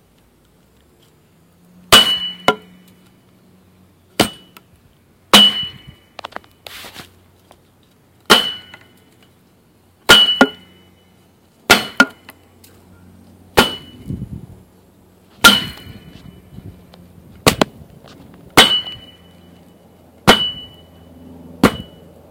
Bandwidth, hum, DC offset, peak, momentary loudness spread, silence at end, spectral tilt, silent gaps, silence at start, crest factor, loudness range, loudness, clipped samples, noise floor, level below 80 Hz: 17 kHz; none; under 0.1%; 0 dBFS; 25 LU; 0.45 s; -2 dB/octave; none; 1.9 s; 20 dB; 6 LU; -13 LUFS; 0.1%; -53 dBFS; -44 dBFS